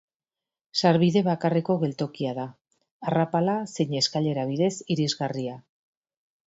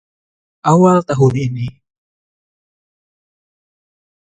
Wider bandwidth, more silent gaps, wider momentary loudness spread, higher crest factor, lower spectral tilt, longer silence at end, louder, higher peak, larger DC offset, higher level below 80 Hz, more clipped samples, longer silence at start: second, 8 kHz vs 9.2 kHz; first, 2.61-2.65 s, 2.91-3.00 s vs none; about the same, 12 LU vs 14 LU; about the same, 20 dB vs 18 dB; second, -6 dB/octave vs -8 dB/octave; second, 0.85 s vs 2.65 s; second, -25 LUFS vs -14 LUFS; second, -6 dBFS vs 0 dBFS; neither; second, -68 dBFS vs -52 dBFS; neither; about the same, 0.75 s vs 0.65 s